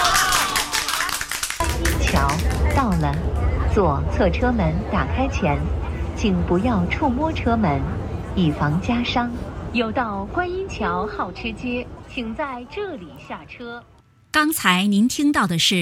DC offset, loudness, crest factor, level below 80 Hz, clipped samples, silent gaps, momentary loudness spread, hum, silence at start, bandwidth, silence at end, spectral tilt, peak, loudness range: under 0.1%; -21 LUFS; 20 dB; -30 dBFS; under 0.1%; none; 12 LU; none; 0 s; 16.5 kHz; 0 s; -4.5 dB/octave; -2 dBFS; 6 LU